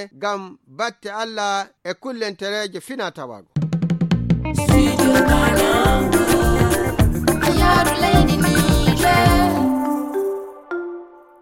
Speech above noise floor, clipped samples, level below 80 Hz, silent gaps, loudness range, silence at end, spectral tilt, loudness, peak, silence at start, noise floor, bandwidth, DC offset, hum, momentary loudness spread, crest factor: 19 dB; under 0.1%; -28 dBFS; none; 9 LU; 0.35 s; -5.5 dB/octave; -18 LUFS; 0 dBFS; 0 s; -37 dBFS; 17 kHz; under 0.1%; none; 14 LU; 16 dB